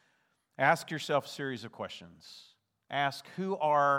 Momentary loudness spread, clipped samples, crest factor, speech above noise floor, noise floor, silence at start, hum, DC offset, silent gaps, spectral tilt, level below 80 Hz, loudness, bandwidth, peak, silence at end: 22 LU; under 0.1%; 22 dB; 43 dB; -74 dBFS; 0.6 s; none; under 0.1%; none; -4.5 dB/octave; -84 dBFS; -32 LUFS; 16.5 kHz; -10 dBFS; 0 s